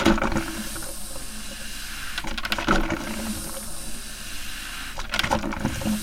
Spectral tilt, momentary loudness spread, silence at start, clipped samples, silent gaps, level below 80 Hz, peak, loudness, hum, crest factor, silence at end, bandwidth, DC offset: -3.5 dB/octave; 11 LU; 0 s; under 0.1%; none; -34 dBFS; -4 dBFS; -28 LUFS; none; 22 dB; 0 s; 17 kHz; under 0.1%